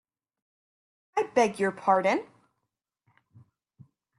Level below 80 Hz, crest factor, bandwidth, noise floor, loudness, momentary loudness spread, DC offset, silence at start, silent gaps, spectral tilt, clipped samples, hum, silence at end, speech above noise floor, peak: -76 dBFS; 22 dB; 12 kHz; -84 dBFS; -26 LUFS; 7 LU; under 0.1%; 1.15 s; none; -5 dB/octave; under 0.1%; none; 1.95 s; 58 dB; -10 dBFS